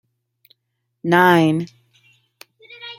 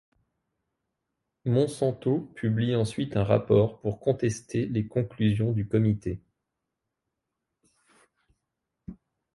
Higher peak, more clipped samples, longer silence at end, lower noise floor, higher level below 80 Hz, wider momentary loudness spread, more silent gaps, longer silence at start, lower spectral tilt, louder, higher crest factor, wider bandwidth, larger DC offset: first, 0 dBFS vs -8 dBFS; neither; second, 0.05 s vs 0.45 s; second, -75 dBFS vs -84 dBFS; second, -66 dBFS vs -54 dBFS; first, 21 LU vs 11 LU; neither; second, 1.05 s vs 1.45 s; about the same, -6.5 dB/octave vs -7.5 dB/octave; first, -16 LUFS vs -27 LUFS; about the same, 20 dB vs 20 dB; first, 16 kHz vs 11.5 kHz; neither